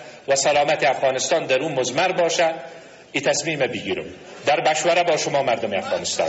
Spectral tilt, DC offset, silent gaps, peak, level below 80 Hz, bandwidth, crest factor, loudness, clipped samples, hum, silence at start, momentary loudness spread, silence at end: -2.5 dB/octave; under 0.1%; none; -6 dBFS; -62 dBFS; 8.2 kHz; 14 dB; -21 LUFS; under 0.1%; none; 0 s; 9 LU; 0 s